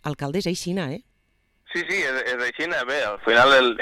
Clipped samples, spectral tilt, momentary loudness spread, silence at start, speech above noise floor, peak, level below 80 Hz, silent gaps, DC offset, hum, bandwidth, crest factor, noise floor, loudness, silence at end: under 0.1%; -4 dB/octave; 14 LU; 0.05 s; 45 dB; -8 dBFS; -56 dBFS; none; under 0.1%; none; 15.5 kHz; 14 dB; -67 dBFS; -22 LUFS; 0 s